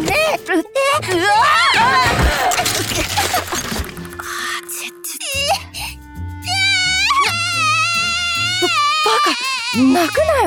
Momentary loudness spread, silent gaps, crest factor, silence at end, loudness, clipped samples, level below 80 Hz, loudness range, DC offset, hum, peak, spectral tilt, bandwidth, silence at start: 13 LU; none; 12 dB; 0 s; -15 LUFS; under 0.1%; -34 dBFS; 6 LU; under 0.1%; none; -4 dBFS; -2.5 dB/octave; 19.5 kHz; 0 s